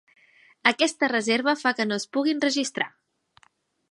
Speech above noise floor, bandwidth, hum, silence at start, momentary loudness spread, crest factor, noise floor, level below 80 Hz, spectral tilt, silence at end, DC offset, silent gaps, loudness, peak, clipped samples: 40 dB; 11.5 kHz; none; 0.65 s; 6 LU; 24 dB; -64 dBFS; -78 dBFS; -2.5 dB/octave; 1.05 s; under 0.1%; none; -24 LUFS; -2 dBFS; under 0.1%